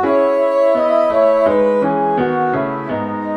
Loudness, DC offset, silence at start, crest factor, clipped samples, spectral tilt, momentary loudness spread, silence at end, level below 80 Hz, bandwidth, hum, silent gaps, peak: -15 LUFS; under 0.1%; 0 s; 12 dB; under 0.1%; -8 dB/octave; 8 LU; 0 s; -52 dBFS; 9.2 kHz; none; none; -2 dBFS